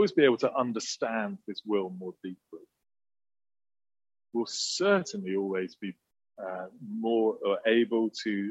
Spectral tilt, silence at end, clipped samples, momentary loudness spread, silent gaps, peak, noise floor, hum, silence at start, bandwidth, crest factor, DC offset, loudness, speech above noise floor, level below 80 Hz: -4 dB/octave; 0 s; under 0.1%; 15 LU; none; -10 dBFS; under -90 dBFS; none; 0 s; 8.4 kHz; 22 dB; under 0.1%; -30 LUFS; over 61 dB; -80 dBFS